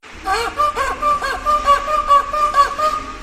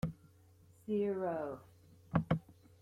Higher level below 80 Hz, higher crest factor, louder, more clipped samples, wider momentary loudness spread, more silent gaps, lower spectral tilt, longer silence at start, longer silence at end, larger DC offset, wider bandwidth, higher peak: first, -36 dBFS vs -62 dBFS; second, 16 dB vs 24 dB; first, -16 LUFS vs -38 LUFS; neither; second, 6 LU vs 17 LU; neither; second, -2.5 dB/octave vs -9 dB/octave; about the same, 0.05 s vs 0.05 s; second, 0 s vs 0.3 s; neither; about the same, 14 kHz vs 13 kHz; first, -2 dBFS vs -16 dBFS